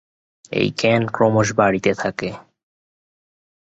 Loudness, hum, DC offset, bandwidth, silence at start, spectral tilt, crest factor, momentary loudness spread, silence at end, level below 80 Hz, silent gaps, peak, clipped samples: -19 LUFS; none; under 0.1%; 8.2 kHz; 0.5 s; -5.5 dB/octave; 20 dB; 12 LU; 1.3 s; -54 dBFS; none; -2 dBFS; under 0.1%